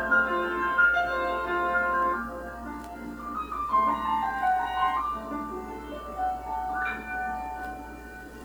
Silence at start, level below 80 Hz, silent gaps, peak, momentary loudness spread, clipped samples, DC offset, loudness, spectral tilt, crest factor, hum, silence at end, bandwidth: 0 s; -48 dBFS; none; -12 dBFS; 15 LU; under 0.1%; under 0.1%; -28 LUFS; -5 dB/octave; 18 dB; none; 0 s; over 20 kHz